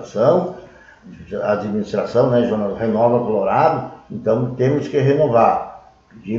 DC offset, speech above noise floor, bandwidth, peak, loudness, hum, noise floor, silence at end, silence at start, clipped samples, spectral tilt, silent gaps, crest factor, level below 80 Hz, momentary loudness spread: under 0.1%; 27 dB; 7.4 kHz; -2 dBFS; -18 LUFS; none; -44 dBFS; 0 s; 0 s; under 0.1%; -8.5 dB/octave; none; 16 dB; -52 dBFS; 13 LU